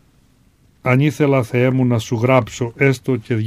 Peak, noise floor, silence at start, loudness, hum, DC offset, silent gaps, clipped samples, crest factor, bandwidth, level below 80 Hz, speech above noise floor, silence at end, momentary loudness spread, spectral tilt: 0 dBFS; -54 dBFS; 0.85 s; -17 LUFS; none; under 0.1%; none; under 0.1%; 18 dB; 14.5 kHz; -52 dBFS; 38 dB; 0 s; 5 LU; -7 dB/octave